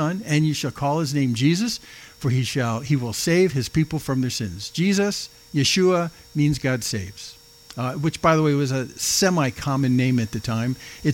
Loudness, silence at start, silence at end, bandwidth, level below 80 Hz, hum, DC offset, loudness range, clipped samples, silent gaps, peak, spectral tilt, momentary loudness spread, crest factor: -22 LUFS; 0 s; 0 s; 17 kHz; -50 dBFS; none; under 0.1%; 2 LU; under 0.1%; none; -4 dBFS; -5 dB/octave; 10 LU; 18 dB